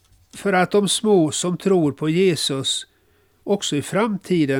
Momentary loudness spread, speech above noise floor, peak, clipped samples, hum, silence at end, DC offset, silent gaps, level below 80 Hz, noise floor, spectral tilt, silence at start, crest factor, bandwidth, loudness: 6 LU; 40 dB; -6 dBFS; under 0.1%; none; 0 s; under 0.1%; none; -60 dBFS; -59 dBFS; -4.5 dB/octave; 0.35 s; 14 dB; 17 kHz; -20 LUFS